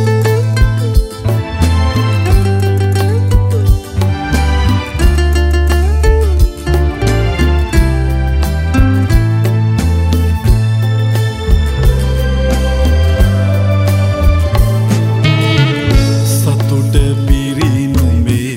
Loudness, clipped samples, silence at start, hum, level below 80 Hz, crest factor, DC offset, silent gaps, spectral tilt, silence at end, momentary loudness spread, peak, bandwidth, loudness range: -12 LUFS; under 0.1%; 0 s; none; -14 dBFS; 10 dB; under 0.1%; none; -6.5 dB/octave; 0 s; 3 LU; 0 dBFS; 16.5 kHz; 1 LU